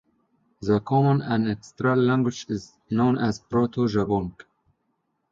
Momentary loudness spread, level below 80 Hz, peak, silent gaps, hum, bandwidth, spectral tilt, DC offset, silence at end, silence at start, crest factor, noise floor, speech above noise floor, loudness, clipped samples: 11 LU; -54 dBFS; -10 dBFS; none; none; 7.6 kHz; -7.5 dB/octave; under 0.1%; 1 s; 0.6 s; 16 dB; -74 dBFS; 51 dB; -24 LUFS; under 0.1%